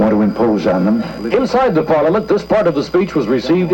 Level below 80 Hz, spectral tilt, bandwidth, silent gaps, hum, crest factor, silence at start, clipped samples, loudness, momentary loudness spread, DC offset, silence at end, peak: -42 dBFS; -7.5 dB/octave; 17 kHz; none; none; 10 dB; 0 s; under 0.1%; -15 LUFS; 3 LU; under 0.1%; 0 s; -4 dBFS